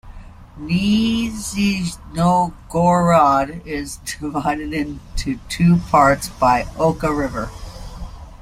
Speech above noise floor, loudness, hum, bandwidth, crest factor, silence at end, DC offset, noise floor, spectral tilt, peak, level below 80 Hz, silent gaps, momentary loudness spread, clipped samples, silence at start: 19 dB; -18 LUFS; none; 15 kHz; 18 dB; 0 s; under 0.1%; -37 dBFS; -6 dB/octave; -2 dBFS; -36 dBFS; none; 15 LU; under 0.1%; 0.05 s